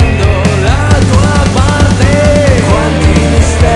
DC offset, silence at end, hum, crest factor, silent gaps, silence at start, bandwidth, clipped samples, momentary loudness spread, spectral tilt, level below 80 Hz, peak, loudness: under 0.1%; 0 s; none; 6 dB; none; 0 s; 11 kHz; 3%; 2 LU; -6 dB/octave; -14 dBFS; 0 dBFS; -8 LUFS